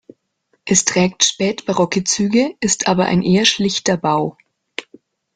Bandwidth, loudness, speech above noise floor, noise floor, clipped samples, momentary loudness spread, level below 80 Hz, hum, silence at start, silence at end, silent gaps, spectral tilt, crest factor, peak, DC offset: 9.8 kHz; -16 LUFS; 49 dB; -66 dBFS; under 0.1%; 16 LU; -54 dBFS; none; 0.65 s; 0.55 s; none; -3.5 dB/octave; 18 dB; 0 dBFS; under 0.1%